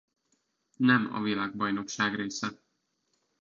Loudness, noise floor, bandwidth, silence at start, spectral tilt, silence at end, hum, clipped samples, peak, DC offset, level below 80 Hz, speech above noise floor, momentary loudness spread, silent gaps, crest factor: -29 LUFS; -78 dBFS; 7.6 kHz; 0.8 s; -4.5 dB/octave; 0.85 s; none; under 0.1%; -8 dBFS; under 0.1%; -70 dBFS; 49 dB; 10 LU; none; 22 dB